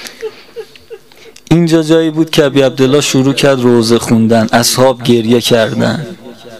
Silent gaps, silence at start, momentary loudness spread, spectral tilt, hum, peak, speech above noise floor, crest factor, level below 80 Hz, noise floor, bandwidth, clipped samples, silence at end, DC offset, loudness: none; 0 s; 17 LU; -5 dB/octave; none; 0 dBFS; 30 dB; 10 dB; -44 dBFS; -39 dBFS; 16 kHz; 0.3%; 0 s; 0.9%; -10 LUFS